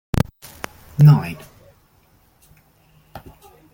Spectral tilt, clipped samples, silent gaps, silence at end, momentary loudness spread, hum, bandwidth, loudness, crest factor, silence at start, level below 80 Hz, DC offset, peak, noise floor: -8 dB/octave; under 0.1%; none; 0.55 s; 24 LU; none; 17 kHz; -16 LUFS; 20 dB; 0.15 s; -42 dBFS; under 0.1%; -2 dBFS; -57 dBFS